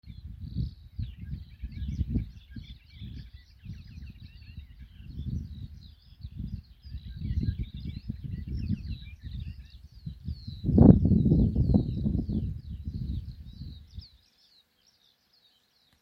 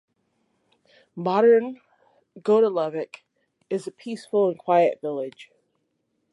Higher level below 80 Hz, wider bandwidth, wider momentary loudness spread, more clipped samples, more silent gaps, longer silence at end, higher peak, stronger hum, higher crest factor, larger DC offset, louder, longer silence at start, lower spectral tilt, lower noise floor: first, -38 dBFS vs -82 dBFS; second, 6 kHz vs 11 kHz; first, 24 LU vs 17 LU; neither; neither; first, 1.95 s vs 0.9 s; first, 0 dBFS vs -8 dBFS; neither; first, 30 dB vs 16 dB; neither; second, -29 LUFS vs -23 LUFS; second, 0.05 s vs 1.15 s; first, -11 dB/octave vs -7 dB/octave; second, -67 dBFS vs -74 dBFS